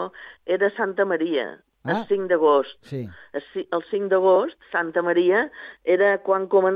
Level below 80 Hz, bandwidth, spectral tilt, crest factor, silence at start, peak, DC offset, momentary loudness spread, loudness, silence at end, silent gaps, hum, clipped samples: -68 dBFS; 5 kHz; -8 dB/octave; 16 dB; 0 s; -6 dBFS; under 0.1%; 15 LU; -22 LUFS; 0 s; none; none; under 0.1%